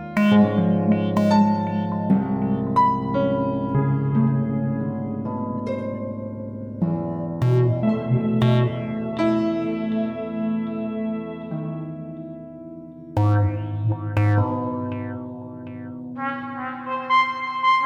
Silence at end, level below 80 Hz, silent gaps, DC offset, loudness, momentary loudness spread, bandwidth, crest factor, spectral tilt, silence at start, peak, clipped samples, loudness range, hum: 0 s; -52 dBFS; none; under 0.1%; -23 LUFS; 14 LU; 7.6 kHz; 16 dB; -8.5 dB/octave; 0 s; -6 dBFS; under 0.1%; 6 LU; none